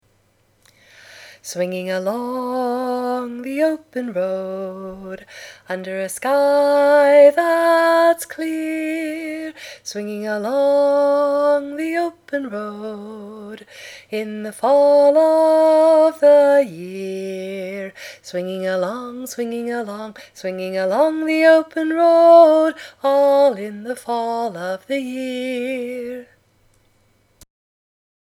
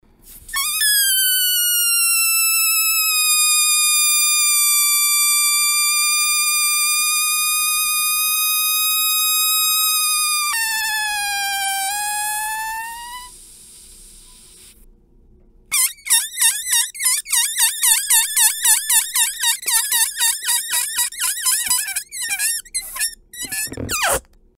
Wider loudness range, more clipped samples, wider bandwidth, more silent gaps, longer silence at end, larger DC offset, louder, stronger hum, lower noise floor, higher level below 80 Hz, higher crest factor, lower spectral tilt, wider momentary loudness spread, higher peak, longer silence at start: about the same, 11 LU vs 9 LU; neither; about the same, 15.5 kHz vs 16.5 kHz; neither; first, 2.05 s vs 0.35 s; neither; about the same, -17 LUFS vs -15 LUFS; neither; first, -60 dBFS vs -50 dBFS; second, -68 dBFS vs -52 dBFS; about the same, 18 dB vs 18 dB; first, -5 dB/octave vs 2.5 dB/octave; first, 19 LU vs 10 LU; about the same, 0 dBFS vs 0 dBFS; first, 1.15 s vs 0.25 s